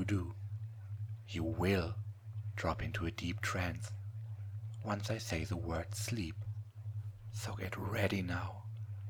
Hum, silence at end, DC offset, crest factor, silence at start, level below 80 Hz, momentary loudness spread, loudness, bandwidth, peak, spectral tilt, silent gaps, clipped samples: none; 0 s; under 0.1%; 22 dB; 0 s; -56 dBFS; 10 LU; -40 LUFS; 18.5 kHz; -18 dBFS; -5.5 dB/octave; none; under 0.1%